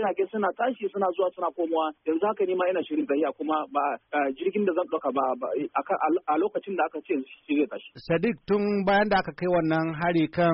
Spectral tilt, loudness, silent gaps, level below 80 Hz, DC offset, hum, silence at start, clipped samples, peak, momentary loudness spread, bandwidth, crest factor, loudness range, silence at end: -5 dB/octave; -27 LUFS; none; -60 dBFS; under 0.1%; none; 0 s; under 0.1%; -10 dBFS; 5 LU; 5.6 kHz; 16 dB; 2 LU; 0 s